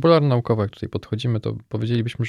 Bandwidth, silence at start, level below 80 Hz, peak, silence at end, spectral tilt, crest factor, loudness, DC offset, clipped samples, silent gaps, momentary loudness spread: 10.5 kHz; 0 s; -52 dBFS; -4 dBFS; 0 s; -8.5 dB/octave; 18 dB; -23 LUFS; under 0.1%; under 0.1%; none; 11 LU